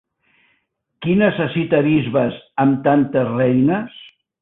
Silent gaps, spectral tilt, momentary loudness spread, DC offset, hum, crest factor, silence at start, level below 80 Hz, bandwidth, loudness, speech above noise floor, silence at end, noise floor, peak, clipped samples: none; -12 dB/octave; 7 LU; under 0.1%; none; 16 dB; 1 s; -54 dBFS; 4 kHz; -17 LUFS; 51 dB; 0.35 s; -68 dBFS; -2 dBFS; under 0.1%